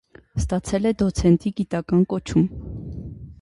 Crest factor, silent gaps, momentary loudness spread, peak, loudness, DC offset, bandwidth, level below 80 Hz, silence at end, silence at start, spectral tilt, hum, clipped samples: 18 dB; none; 16 LU; -4 dBFS; -22 LUFS; under 0.1%; 11.5 kHz; -36 dBFS; 0.1 s; 0.35 s; -7.5 dB/octave; none; under 0.1%